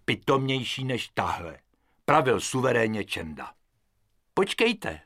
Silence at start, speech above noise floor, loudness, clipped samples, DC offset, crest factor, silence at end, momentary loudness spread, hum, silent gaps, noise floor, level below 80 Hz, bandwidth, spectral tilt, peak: 0.1 s; 44 dB; -26 LUFS; under 0.1%; under 0.1%; 24 dB; 0.05 s; 12 LU; none; none; -71 dBFS; -58 dBFS; 16 kHz; -4.5 dB/octave; -4 dBFS